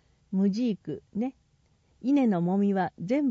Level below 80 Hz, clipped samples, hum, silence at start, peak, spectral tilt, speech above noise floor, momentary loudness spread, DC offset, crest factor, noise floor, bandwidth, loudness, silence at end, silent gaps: -68 dBFS; under 0.1%; none; 0.3 s; -16 dBFS; -8.5 dB/octave; 40 dB; 11 LU; under 0.1%; 12 dB; -66 dBFS; 7.2 kHz; -28 LUFS; 0 s; none